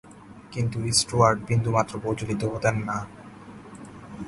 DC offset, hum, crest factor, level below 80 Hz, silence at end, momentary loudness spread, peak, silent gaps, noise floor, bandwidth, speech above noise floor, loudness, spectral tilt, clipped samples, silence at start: under 0.1%; none; 22 dB; -50 dBFS; 0 s; 23 LU; -4 dBFS; none; -46 dBFS; 11.5 kHz; 22 dB; -24 LUFS; -4.5 dB/octave; under 0.1%; 0.05 s